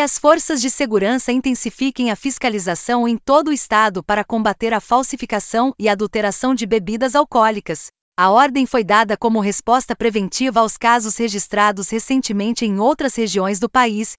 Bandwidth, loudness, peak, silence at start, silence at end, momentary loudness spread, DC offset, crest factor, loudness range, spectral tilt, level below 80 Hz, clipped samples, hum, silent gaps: 8 kHz; -17 LUFS; 0 dBFS; 0 s; 0.05 s; 6 LU; under 0.1%; 16 dB; 2 LU; -4 dB/octave; -50 dBFS; under 0.1%; none; 8.01-8.12 s